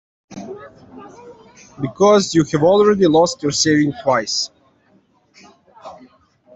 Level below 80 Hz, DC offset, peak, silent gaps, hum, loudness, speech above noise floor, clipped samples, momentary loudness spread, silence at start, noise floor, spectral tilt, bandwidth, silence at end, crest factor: -54 dBFS; under 0.1%; -2 dBFS; none; none; -15 LUFS; 41 dB; under 0.1%; 21 LU; 0.3 s; -57 dBFS; -4.5 dB/octave; 8.4 kHz; 0.65 s; 16 dB